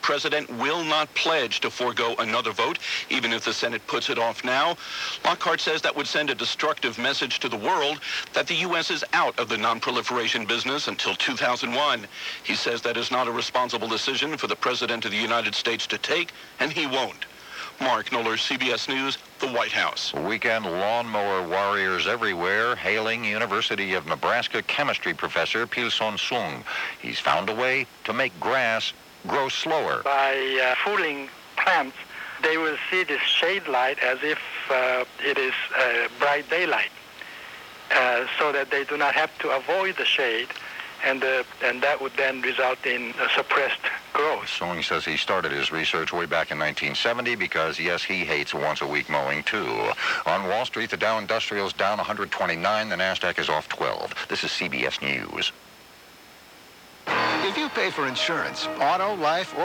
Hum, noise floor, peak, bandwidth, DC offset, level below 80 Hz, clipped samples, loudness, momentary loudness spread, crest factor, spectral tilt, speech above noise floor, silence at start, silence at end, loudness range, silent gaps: none; -49 dBFS; -8 dBFS; 19.5 kHz; under 0.1%; -64 dBFS; under 0.1%; -24 LUFS; 5 LU; 18 dB; -2.5 dB/octave; 24 dB; 0 s; 0 s; 2 LU; none